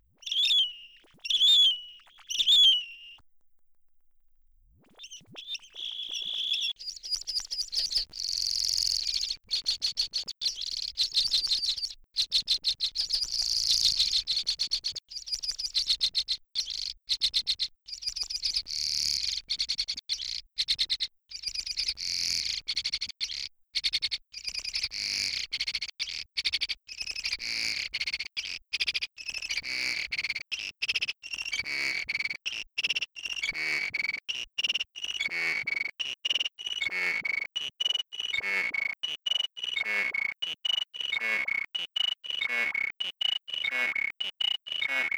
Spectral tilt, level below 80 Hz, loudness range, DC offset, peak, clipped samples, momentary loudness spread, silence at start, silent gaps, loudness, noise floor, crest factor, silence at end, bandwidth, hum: 2 dB/octave; -60 dBFS; 5 LU; under 0.1%; -12 dBFS; under 0.1%; 9 LU; 0.2 s; none; -28 LUFS; -62 dBFS; 20 dB; 0 s; over 20 kHz; none